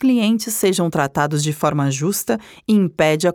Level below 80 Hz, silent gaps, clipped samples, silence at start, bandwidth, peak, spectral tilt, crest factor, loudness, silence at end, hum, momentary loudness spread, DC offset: -54 dBFS; none; under 0.1%; 0 s; over 20 kHz; -2 dBFS; -5 dB/octave; 16 dB; -18 LUFS; 0 s; none; 4 LU; under 0.1%